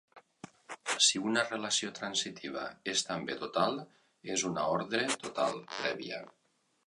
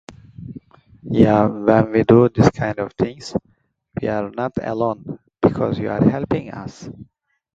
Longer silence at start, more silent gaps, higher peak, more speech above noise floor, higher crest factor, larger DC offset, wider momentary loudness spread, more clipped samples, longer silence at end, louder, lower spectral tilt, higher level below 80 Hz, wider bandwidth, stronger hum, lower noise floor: about the same, 0.15 s vs 0.1 s; neither; second, -10 dBFS vs 0 dBFS; about the same, 21 dB vs 24 dB; about the same, 24 dB vs 20 dB; neither; second, 16 LU vs 21 LU; neither; about the same, 0.6 s vs 0.5 s; second, -32 LUFS vs -18 LUFS; second, -2 dB/octave vs -8 dB/octave; second, -74 dBFS vs -44 dBFS; first, 11.5 kHz vs 7.8 kHz; neither; first, -54 dBFS vs -42 dBFS